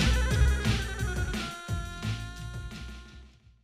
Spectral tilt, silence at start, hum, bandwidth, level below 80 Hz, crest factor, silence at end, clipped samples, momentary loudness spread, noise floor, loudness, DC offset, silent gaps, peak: -5 dB/octave; 0 s; none; 14.5 kHz; -32 dBFS; 16 dB; 0.35 s; under 0.1%; 17 LU; -52 dBFS; -31 LUFS; under 0.1%; none; -12 dBFS